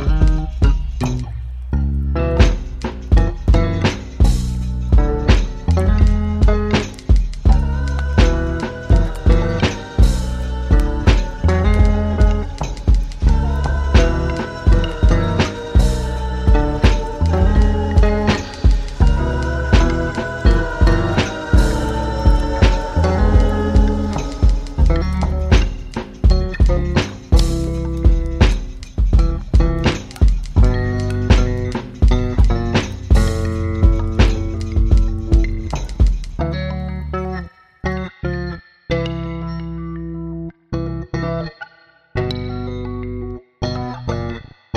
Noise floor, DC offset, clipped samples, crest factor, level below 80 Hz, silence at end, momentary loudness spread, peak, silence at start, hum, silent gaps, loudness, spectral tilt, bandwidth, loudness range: -49 dBFS; under 0.1%; under 0.1%; 16 dB; -18 dBFS; 0 s; 10 LU; 0 dBFS; 0 s; none; none; -18 LUFS; -7 dB/octave; 10 kHz; 8 LU